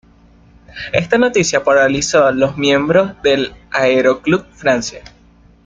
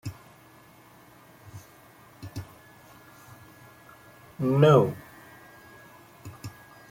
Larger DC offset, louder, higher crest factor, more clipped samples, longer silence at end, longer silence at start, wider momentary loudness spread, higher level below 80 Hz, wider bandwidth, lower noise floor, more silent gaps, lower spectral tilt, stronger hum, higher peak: neither; first, -14 LUFS vs -22 LUFS; second, 14 dB vs 24 dB; neither; first, 0.65 s vs 0.4 s; first, 0.75 s vs 0.05 s; second, 7 LU vs 30 LU; first, -46 dBFS vs -62 dBFS; second, 9.4 kHz vs 17 kHz; second, -46 dBFS vs -54 dBFS; neither; second, -4 dB/octave vs -7.5 dB/octave; neither; first, 0 dBFS vs -6 dBFS